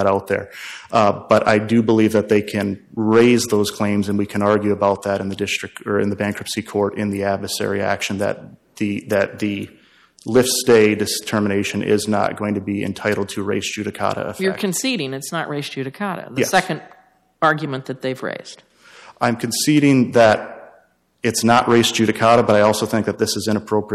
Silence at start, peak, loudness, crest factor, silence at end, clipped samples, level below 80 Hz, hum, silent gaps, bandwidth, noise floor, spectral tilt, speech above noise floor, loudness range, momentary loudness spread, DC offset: 0 s; -4 dBFS; -19 LUFS; 14 dB; 0 s; under 0.1%; -56 dBFS; none; none; 15 kHz; -55 dBFS; -4.5 dB/octave; 37 dB; 6 LU; 11 LU; under 0.1%